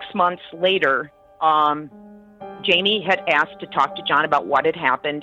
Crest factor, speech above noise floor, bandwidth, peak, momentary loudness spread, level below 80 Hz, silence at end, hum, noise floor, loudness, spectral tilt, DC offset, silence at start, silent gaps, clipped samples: 16 dB; 19 dB; 8.2 kHz; -4 dBFS; 8 LU; -64 dBFS; 0 s; none; -39 dBFS; -19 LUFS; -5 dB/octave; under 0.1%; 0 s; none; under 0.1%